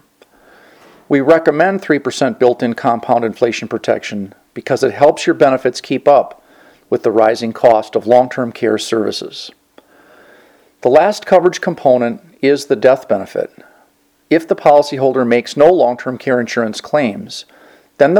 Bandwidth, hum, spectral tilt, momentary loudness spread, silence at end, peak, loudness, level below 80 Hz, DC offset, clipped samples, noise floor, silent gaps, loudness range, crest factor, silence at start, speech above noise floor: 13.5 kHz; none; -5.5 dB/octave; 11 LU; 0 s; 0 dBFS; -14 LUFS; -58 dBFS; under 0.1%; 0.2%; -55 dBFS; none; 3 LU; 14 dB; 1.1 s; 42 dB